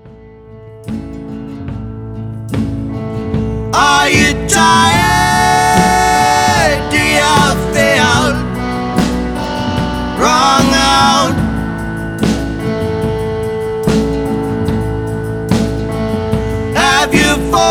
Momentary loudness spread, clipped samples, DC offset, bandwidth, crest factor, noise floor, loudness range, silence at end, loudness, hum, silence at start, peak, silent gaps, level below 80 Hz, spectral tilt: 13 LU; under 0.1%; under 0.1%; 19 kHz; 12 dB; -36 dBFS; 7 LU; 0 s; -12 LUFS; none; 0.05 s; 0 dBFS; none; -28 dBFS; -4 dB/octave